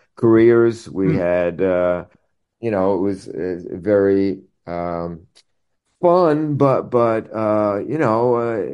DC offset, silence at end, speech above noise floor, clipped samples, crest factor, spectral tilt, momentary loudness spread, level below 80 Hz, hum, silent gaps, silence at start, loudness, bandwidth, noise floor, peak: under 0.1%; 0 s; 53 dB; under 0.1%; 16 dB; -8.5 dB/octave; 12 LU; -54 dBFS; none; none; 0.2 s; -18 LUFS; 9.8 kHz; -70 dBFS; -2 dBFS